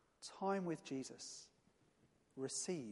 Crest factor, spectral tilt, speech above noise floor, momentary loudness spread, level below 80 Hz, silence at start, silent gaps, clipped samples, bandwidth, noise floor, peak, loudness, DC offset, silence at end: 18 dB; -4 dB/octave; 31 dB; 15 LU; -88 dBFS; 0.2 s; none; under 0.1%; 11.5 kHz; -75 dBFS; -28 dBFS; -45 LUFS; under 0.1%; 0 s